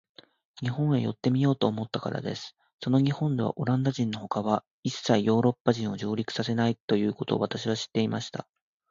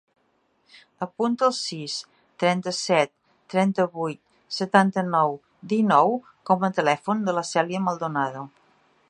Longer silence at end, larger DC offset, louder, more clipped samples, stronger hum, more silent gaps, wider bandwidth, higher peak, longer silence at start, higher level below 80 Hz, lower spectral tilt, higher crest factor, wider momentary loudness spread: about the same, 0.5 s vs 0.6 s; neither; second, -28 LUFS vs -24 LUFS; neither; neither; first, 2.73-2.79 s, 4.67-4.83 s, 5.60-5.65 s, 6.80-6.88 s vs none; second, 7.6 kHz vs 11 kHz; second, -6 dBFS vs -2 dBFS; second, 0.55 s vs 1 s; first, -64 dBFS vs -76 dBFS; first, -6.5 dB/octave vs -5 dB/octave; about the same, 22 dB vs 22 dB; second, 9 LU vs 12 LU